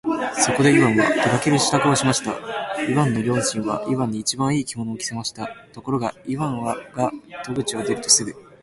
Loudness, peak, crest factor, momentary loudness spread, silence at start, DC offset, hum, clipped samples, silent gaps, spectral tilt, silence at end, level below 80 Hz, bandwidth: -21 LUFS; -2 dBFS; 20 dB; 12 LU; 0.05 s; under 0.1%; none; under 0.1%; none; -4 dB/octave; 0.2 s; -54 dBFS; 11.5 kHz